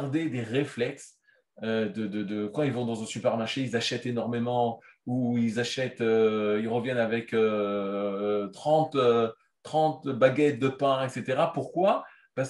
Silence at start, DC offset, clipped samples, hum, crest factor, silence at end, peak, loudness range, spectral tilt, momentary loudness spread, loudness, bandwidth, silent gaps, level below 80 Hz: 0 s; under 0.1%; under 0.1%; none; 20 dB; 0 s; -6 dBFS; 5 LU; -6 dB/octave; 8 LU; -28 LUFS; 11.5 kHz; none; -74 dBFS